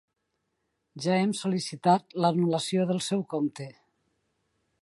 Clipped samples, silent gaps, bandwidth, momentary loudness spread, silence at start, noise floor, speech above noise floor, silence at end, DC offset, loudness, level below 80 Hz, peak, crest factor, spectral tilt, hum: under 0.1%; none; 11.5 kHz; 8 LU; 0.95 s; -79 dBFS; 52 dB; 1.1 s; under 0.1%; -27 LUFS; -76 dBFS; -10 dBFS; 20 dB; -5.5 dB/octave; none